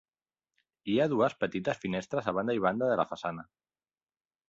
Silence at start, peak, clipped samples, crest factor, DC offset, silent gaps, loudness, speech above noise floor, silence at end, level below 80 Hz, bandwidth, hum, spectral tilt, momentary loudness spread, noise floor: 0.85 s; -12 dBFS; under 0.1%; 20 dB; under 0.1%; none; -31 LUFS; over 60 dB; 1.05 s; -68 dBFS; 7.8 kHz; none; -6.5 dB/octave; 10 LU; under -90 dBFS